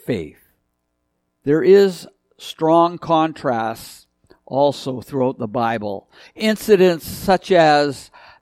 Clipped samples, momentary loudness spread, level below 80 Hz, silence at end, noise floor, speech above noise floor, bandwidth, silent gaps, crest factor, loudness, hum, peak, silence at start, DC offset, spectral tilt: under 0.1%; 20 LU; -52 dBFS; 0.4 s; -72 dBFS; 54 dB; 15.5 kHz; none; 18 dB; -17 LUFS; none; -2 dBFS; 0.1 s; under 0.1%; -5.5 dB/octave